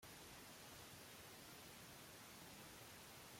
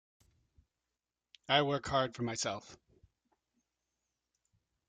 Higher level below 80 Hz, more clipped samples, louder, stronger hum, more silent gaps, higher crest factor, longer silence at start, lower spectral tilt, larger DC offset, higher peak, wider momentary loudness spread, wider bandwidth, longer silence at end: second, -78 dBFS vs -68 dBFS; neither; second, -58 LUFS vs -33 LUFS; neither; neither; second, 14 dB vs 26 dB; second, 0 s vs 1.5 s; about the same, -2.5 dB/octave vs -3.5 dB/octave; neither; second, -46 dBFS vs -14 dBFS; second, 0 LU vs 8 LU; first, 16.5 kHz vs 9.6 kHz; second, 0 s vs 2.15 s